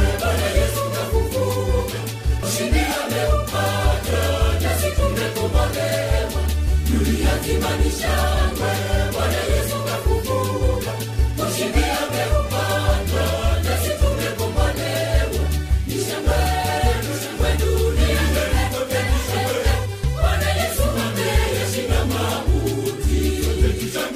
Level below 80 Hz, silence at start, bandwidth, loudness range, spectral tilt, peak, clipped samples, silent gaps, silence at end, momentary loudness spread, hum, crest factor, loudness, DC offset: -22 dBFS; 0 s; 15.5 kHz; 1 LU; -5 dB/octave; -6 dBFS; under 0.1%; none; 0 s; 3 LU; none; 14 dB; -21 LUFS; under 0.1%